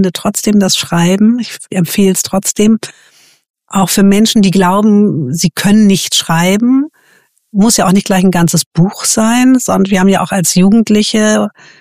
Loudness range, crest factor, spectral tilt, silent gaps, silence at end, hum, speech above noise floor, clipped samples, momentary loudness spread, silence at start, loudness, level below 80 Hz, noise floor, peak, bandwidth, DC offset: 2 LU; 10 dB; -4.5 dB/octave; 3.50-3.54 s, 8.66-8.71 s; 0.3 s; none; 41 dB; under 0.1%; 6 LU; 0 s; -10 LUFS; -42 dBFS; -51 dBFS; 0 dBFS; 15.5 kHz; under 0.1%